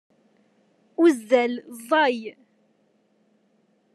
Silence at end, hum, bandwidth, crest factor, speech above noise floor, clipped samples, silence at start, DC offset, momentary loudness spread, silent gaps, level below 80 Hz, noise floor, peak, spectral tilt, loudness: 1.65 s; none; 12.5 kHz; 20 dB; 44 dB; under 0.1%; 1 s; under 0.1%; 16 LU; none; under -90 dBFS; -65 dBFS; -6 dBFS; -3.5 dB/octave; -22 LUFS